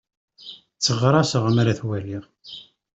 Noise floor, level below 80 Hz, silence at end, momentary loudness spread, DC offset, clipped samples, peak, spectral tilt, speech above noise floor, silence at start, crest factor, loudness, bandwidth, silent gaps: -44 dBFS; -56 dBFS; 0.35 s; 22 LU; under 0.1%; under 0.1%; -4 dBFS; -5.5 dB/octave; 23 dB; 0.45 s; 20 dB; -21 LUFS; 8.2 kHz; none